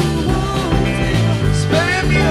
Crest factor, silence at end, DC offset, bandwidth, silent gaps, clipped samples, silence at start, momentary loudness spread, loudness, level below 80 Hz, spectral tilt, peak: 12 dB; 0 s; under 0.1%; 13.5 kHz; none; under 0.1%; 0 s; 3 LU; -16 LUFS; -24 dBFS; -6 dB/octave; -2 dBFS